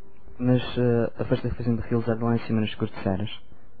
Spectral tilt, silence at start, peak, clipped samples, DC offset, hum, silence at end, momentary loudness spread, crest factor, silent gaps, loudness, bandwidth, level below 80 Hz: -11 dB/octave; 0.25 s; -8 dBFS; under 0.1%; 2%; none; 0.45 s; 6 LU; 16 dB; none; -26 LUFS; 4.8 kHz; -46 dBFS